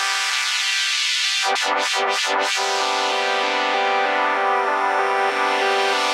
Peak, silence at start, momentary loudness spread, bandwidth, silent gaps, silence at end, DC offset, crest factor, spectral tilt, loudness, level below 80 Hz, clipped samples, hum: -6 dBFS; 0 s; 2 LU; 16 kHz; none; 0 s; under 0.1%; 14 dB; 1.5 dB/octave; -19 LUFS; -90 dBFS; under 0.1%; none